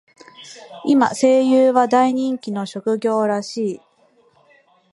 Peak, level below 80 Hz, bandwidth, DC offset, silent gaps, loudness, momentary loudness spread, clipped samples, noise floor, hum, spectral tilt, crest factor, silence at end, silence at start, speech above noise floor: -2 dBFS; -70 dBFS; 11.5 kHz; under 0.1%; none; -18 LUFS; 18 LU; under 0.1%; -57 dBFS; none; -5 dB/octave; 18 dB; 1.15 s; 0.4 s; 40 dB